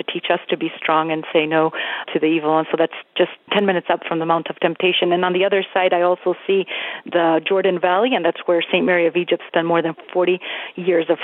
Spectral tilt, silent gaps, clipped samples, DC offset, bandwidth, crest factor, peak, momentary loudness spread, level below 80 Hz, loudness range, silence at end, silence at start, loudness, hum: -8.5 dB/octave; none; under 0.1%; under 0.1%; 4.1 kHz; 18 dB; -2 dBFS; 5 LU; -80 dBFS; 1 LU; 0 s; 0.1 s; -19 LUFS; none